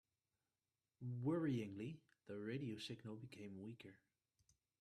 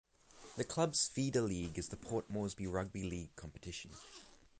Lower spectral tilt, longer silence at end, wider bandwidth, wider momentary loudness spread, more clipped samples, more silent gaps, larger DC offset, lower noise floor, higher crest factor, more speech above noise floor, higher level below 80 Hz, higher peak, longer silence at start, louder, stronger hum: first, -7 dB/octave vs -4.5 dB/octave; first, 0.85 s vs 0.25 s; first, 12.5 kHz vs 9.6 kHz; second, 14 LU vs 17 LU; neither; neither; neither; first, under -90 dBFS vs -60 dBFS; about the same, 18 dB vs 20 dB; first, over 43 dB vs 20 dB; second, -84 dBFS vs -58 dBFS; second, -32 dBFS vs -20 dBFS; first, 1 s vs 0.35 s; second, -48 LUFS vs -39 LUFS; neither